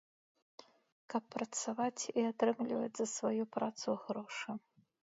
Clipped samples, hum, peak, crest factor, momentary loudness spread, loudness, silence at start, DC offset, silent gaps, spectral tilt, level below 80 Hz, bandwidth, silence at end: under 0.1%; none; -18 dBFS; 20 dB; 8 LU; -38 LUFS; 1.1 s; under 0.1%; none; -4 dB/octave; -86 dBFS; 7.6 kHz; 0.45 s